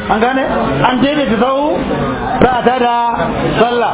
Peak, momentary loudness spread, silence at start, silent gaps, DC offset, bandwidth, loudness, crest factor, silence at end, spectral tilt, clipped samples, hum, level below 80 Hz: 0 dBFS; 4 LU; 0 s; none; under 0.1%; 4 kHz; -13 LUFS; 12 dB; 0 s; -10 dB/octave; under 0.1%; none; -32 dBFS